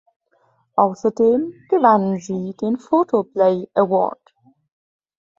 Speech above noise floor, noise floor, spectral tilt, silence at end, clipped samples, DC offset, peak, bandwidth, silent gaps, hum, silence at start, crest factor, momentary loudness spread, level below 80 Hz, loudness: 44 dB; -62 dBFS; -8 dB/octave; 1.25 s; under 0.1%; under 0.1%; -2 dBFS; 7.6 kHz; none; none; 0.75 s; 18 dB; 9 LU; -66 dBFS; -19 LUFS